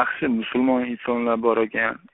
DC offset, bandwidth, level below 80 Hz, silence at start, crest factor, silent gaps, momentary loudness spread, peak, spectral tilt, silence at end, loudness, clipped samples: under 0.1%; 4 kHz; -58 dBFS; 0 s; 18 dB; none; 3 LU; -4 dBFS; -3.5 dB/octave; 0.15 s; -22 LUFS; under 0.1%